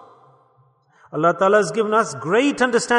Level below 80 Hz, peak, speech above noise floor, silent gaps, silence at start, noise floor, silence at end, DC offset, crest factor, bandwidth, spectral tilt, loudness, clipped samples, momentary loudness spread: -66 dBFS; -4 dBFS; 40 dB; none; 1.1 s; -58 dBFS; 0 s; under 0.1%; 16 dB; 11 kHz; -4.5 dB/octave; -18 LUFS; under 0.1%; 4 LU